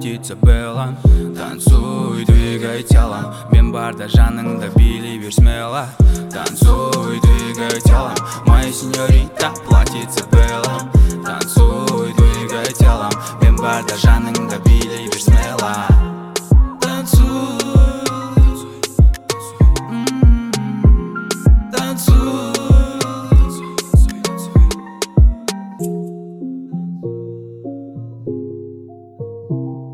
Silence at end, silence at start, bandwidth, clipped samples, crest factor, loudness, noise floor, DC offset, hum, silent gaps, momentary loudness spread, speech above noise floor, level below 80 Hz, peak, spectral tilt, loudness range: 0 s; 0 s; 15.5 kHz; under 0.1%; 14 dB; -15 LUFS; -36 dBFS; under 0.1%; none; none; 12 LU; 23 dB; -16 dBFS; 0 dBFS; -6 dB/octave; 4 LU